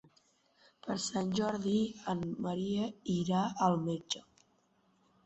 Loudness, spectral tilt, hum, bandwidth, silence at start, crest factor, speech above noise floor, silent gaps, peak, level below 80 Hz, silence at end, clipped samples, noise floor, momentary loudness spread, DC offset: -34 LUFS; -5.5 dB/octave; none; 8 kHz; 0.85 s; 20 dB; 38 dB; none; -16 dBFS; -68 dBFS; 1.05 s; under 0.1%; -72 dBFS; 8 LU; under 0.1%